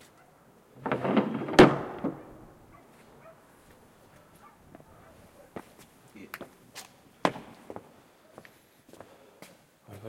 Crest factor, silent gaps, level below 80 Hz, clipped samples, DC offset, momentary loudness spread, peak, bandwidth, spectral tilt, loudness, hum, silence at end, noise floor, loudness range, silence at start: 28 dB; none; -60 dBFS; under 0.1%; under 0.1%; 28 LU; -4 dBFS; 16 kHz; -6 dB/octave; -26 LUFS; none; 0 s; -59 dBFS; 25 LU; 0.8 s